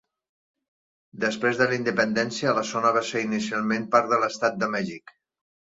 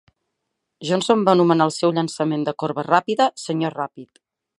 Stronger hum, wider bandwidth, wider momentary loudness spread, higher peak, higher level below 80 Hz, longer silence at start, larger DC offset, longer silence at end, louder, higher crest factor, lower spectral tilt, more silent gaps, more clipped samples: neither; second, 7.8 kHz vs 11.5 kHz; second, 6 LU vs 10 LU; second, -6 dBFS vs -2 dBFS; about the same, -68 dBFS vs -70 dBFS; first, 1.15 s vs 0.8 s; neither; first, 0.8 s vs 0.55 s; second, -24 LUFS vs -20 LUFS; about the same, 20 dB vs 20 dB; about the same, -4.5 dB/octave vs -5.5 dB/octave; neither; neither